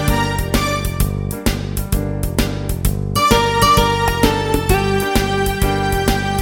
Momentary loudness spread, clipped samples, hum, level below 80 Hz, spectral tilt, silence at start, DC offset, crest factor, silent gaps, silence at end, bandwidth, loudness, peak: 8 LU; under 0.1%; none; -24 dBFS; -4.5 dB/octave; 0 s; under 0.1%; 16 dB; none; 0 s; 19.5 kHz; -17 LUFS; 0 dBFS